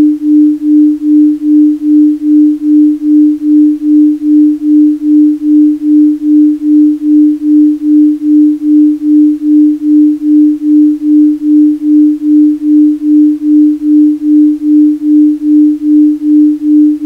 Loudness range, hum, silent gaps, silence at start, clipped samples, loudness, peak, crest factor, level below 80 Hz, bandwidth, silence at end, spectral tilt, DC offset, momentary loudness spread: 0 LU; none; none; 0 s; under 0.1%; -7 LUFS; 0 dBFS; 6 dB; -52 dBFS; 0.7 kHz; 0 s; -8 dB/octave; under 0.1%; 0 LU